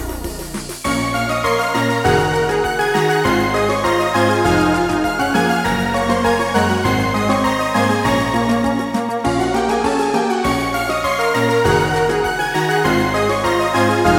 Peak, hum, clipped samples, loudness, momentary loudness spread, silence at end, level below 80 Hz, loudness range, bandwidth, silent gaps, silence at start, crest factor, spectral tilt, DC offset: -2 dBFS; none; under 0.1%; -17 LUFS; 4 LU; 0 s; -36 dBFS; 1 LU; 18 kHz; none; 0 s; 16 dB; -5 dB/octave; under 0.1%